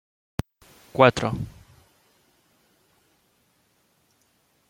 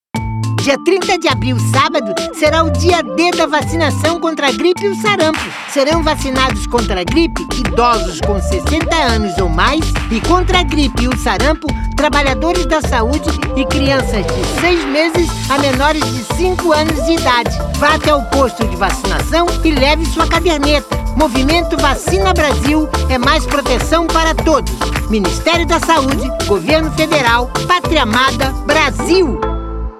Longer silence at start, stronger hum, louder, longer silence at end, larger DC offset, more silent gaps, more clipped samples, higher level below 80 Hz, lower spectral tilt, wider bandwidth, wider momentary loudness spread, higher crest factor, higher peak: first, 0.95 s vs 0.15 s; neither; second, -24 LUFS vs -13 LUFS; first, 3.2 s vs 0 s; neither; neither; neither; second, -52 dBFS vs -22 dBFS; first, -6 dB/octave vs -4.5 dB/octave; about the same, 16.5 kHz vs 15.5 kHz; first, 19 LU vs 5 LU; first, 28 dB vs 14 dB; about the same, -2 dBFS vs 0 dBFS